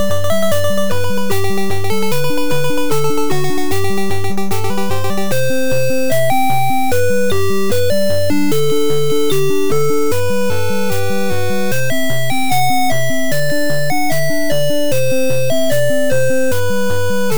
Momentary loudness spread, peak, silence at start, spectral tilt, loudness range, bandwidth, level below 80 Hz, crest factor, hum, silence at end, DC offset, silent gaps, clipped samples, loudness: 3 LU; -4 dBFS; 0 s; -4.5 dB/octave; 2 LU; over 20 kHz; -42 dBFS; 10 dB; none; 0 s; 30%; none; under 0.1%; -17 LUFS